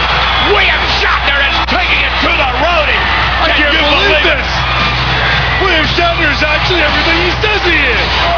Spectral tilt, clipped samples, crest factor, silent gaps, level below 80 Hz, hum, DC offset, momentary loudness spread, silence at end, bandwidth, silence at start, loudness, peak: -4.5 dB/octave; under 0.1%; 10 dB; none; -20 dBFS; 60 Hz at -20 dBFS; 0.8%; 3 LU; 0 s; 5.4 kHz; 0 s; -9 LUFS; 0 dBFS